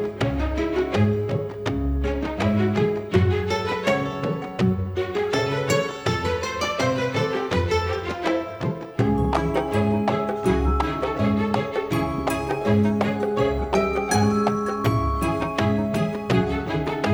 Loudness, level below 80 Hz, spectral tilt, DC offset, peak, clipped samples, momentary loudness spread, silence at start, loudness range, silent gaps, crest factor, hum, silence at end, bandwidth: -23 LUFS; -34 dBFS; -6.5 dB/octave; under 0.1%; -4 dBFS; under 0.1%; 4 LU; 0 s; 2 LU; none; 18 dB; none; 0 s; over 20 kHz